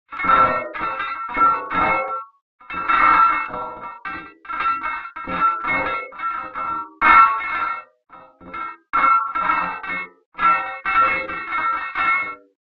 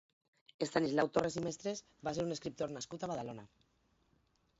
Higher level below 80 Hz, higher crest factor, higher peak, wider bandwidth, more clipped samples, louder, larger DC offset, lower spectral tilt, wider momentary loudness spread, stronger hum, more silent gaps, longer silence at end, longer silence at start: first, -50 dBFS vs -70 dBFS; about the same, 20 dB vs 22 dB; first, 0 dBFS vs -18 dBFS; second, 5.2 kHz vs 7.6 kHz; neither; first, -19 LUFS vs -38 LUFS; neither; first, -6 dB/octave vs -4.5 dB/octave; first, 17 LU vs 10 LU; neither; first, 2.42-2.59 s, 10.26-10.32 s vs none; second, 0.25 s vs 1.15 s; second, 0.1 s vs 0.6 s